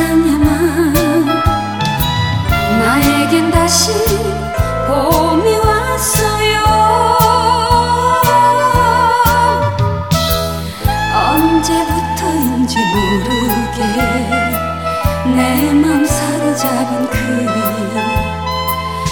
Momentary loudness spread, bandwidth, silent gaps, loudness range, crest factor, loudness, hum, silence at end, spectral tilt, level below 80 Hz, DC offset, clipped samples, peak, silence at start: 6 LU; over 20 kHz; none; 4 LU; 12 dB; -13 LUFS; none; 0 s; -4.5 dB/octave; -26 dBFS; 0.7%; under 0.1%; 0 dBFS; 0 s